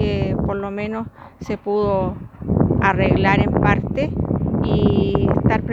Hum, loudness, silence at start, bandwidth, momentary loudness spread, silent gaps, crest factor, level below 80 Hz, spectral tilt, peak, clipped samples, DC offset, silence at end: none; -19 LUFS; 0 s; 7.4 kHz; 11 LU; none; 18 dB; -32 dBFS; -9 dB/octave; 0 dBFS; under 0.1%; under 0.1%; 0 s